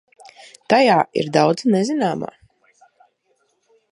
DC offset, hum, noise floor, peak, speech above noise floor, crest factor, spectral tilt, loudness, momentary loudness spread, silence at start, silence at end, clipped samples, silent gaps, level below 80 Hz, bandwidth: under 0.1%; none; -66 dBFS; -2 dBFS; 49 dB; 20 dB; -5.5 dB/octave; -18 LUFS; 10 LU; 0.7 s; 1.65 s; under 0.1%; none; -66 dBFS; 11.5 kHz